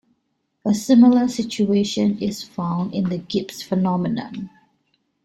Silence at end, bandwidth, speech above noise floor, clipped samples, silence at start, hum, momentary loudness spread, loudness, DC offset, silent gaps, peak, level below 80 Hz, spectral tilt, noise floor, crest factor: 0.75 s; 13.5 kHz; 52 dB; under 0.1%; 0.65 s; none; 14 LU; -20 LUFS; under 0.1%; none; -4 dBFS; -58 dBFS; -6.5 dB/octave; -72 dBFS; 18 dB